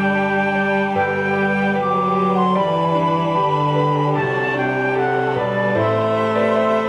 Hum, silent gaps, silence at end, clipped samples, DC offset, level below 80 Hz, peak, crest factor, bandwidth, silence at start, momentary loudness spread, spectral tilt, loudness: none; none; 0 s; under 0.1%; under 0.1%; -58 dBFS; -6 dBFS; 12 dB; 10.5 kHz; 0 s; 2 LU; -7.5 dB/octave; -18 LUFS